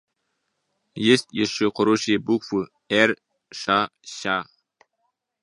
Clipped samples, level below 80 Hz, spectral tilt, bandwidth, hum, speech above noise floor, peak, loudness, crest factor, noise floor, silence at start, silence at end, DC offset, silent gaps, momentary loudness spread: under 0.1%; -64 dBFS; -4 dB/octave; 11.5 kHz; none; 54 dB; -2 dBFS; -22 LUFS; 22 dB; -76 dBFS; 0.95 s; 1 s; under 0.1%; none; 12 LU